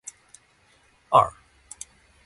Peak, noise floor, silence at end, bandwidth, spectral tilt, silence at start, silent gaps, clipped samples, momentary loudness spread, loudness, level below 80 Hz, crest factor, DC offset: -2 dBFS; -61 dBFS; 0.95 s; 11.5 kHz; -4 dB/octave; 1.1 s; none; under 0.1%; 22 LU; -21 LUFS; -58 dBFS; 26 dB; under 0.1%